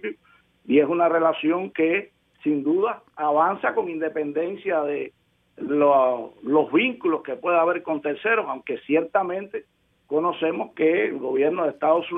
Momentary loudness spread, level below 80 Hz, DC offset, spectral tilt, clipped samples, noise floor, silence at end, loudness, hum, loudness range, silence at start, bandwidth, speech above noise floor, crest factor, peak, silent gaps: 9 LU; -72 dBFS; under 0.1%; -8.5 dB/octave; under 0.1%; -60 dBFS; 0 s; -23 LUFS; none; 3 LU; 0.05 s; 3.9 kHz; 37 dB; 16 dB; -6 dBFS; none